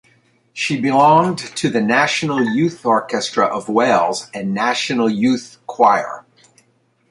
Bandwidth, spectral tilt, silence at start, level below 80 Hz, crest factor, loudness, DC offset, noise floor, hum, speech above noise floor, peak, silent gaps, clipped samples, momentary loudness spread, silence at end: 11.5 kHz; -4.5 dB/octave; 0.55 s; -62 dBFS; 18 dB; -17 LUFS; under 0.1%; -60 dBFS; none; 44 dB; 0 dBFS; none; under 0.1%; 10 LU; 0.9 s